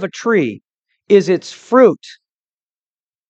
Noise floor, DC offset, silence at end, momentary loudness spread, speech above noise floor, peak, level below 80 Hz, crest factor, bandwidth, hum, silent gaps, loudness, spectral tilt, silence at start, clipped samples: under -90 dBFS; under 0.1%; 1.2 s; 10 LU; over 76 dB; 0 dBFS; -70 dBFS; 16 dB; 8.4 kHz; none; 0.74-0.82 s; -14 LUFS; -6 dB/octave; 0 s; under 0.1%